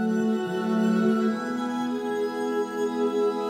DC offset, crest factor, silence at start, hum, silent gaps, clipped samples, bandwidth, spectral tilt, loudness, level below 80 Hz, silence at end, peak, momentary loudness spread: under 0.1%; 12 dB; 0 s; none; none; under 0.1%; 15 kHz; -6.5 dB/octave; -26 LUFS; -72 dBFS; 0 s; -12 dBFS; 6 LU